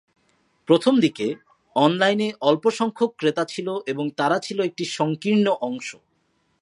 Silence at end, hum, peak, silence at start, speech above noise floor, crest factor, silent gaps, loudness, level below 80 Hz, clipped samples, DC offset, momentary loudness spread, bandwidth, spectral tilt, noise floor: 0.7 s; none; -2 dBFS; 0.7 s; 46 dB; 20 dB; none; -22 LUFS; -74 dBFS; under 0.1%; under 0.1%; 10 LU; 11.5 kHz; -5.5 dB/octave; -68 dBFS